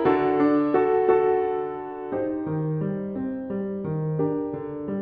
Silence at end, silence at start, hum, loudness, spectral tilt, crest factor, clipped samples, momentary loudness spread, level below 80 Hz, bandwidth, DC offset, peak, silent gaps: 0 s; 0 s; none; -25 LUFS; -11 dB/octave; 16 dB; under 0.1%; 11 LU; -58 dBFS; 4.9 kHz; under 0.1%; -8 dBFS; none